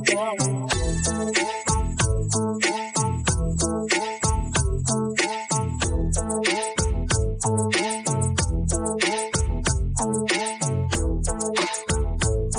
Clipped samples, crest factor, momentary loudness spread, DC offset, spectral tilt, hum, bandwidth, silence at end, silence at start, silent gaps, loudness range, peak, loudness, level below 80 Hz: under 0.1%; 18 dB; 3 LU; under 0.1%; -4 dB/octave; none; 10.5 kHz; 0 s; 0 s; none; 1 LU; -6 dBFS; -24 LUFS; -30 dBFS